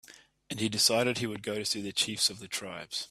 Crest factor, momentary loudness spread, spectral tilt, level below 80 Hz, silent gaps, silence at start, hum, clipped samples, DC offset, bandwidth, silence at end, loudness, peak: 22 dB; 12 LU; -2.5 dB/octave; -68 dBFS; none; 0.1 s; none; under 0.1%; under 0.1%; 15.5 kHz; 0.05 s; -29 LUFS; -10 dBFS